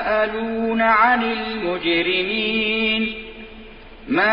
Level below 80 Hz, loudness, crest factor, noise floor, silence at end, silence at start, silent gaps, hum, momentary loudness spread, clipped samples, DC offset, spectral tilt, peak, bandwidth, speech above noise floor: -46 dBFS; -19 LUFS; 16 dB; -40 dBFS; 0 s; 0 s; none; none; 14 LU; under 0.1%; under 0.1%; -9 dB/octave; -4 dBFS; 5.4 kHz; 20 dB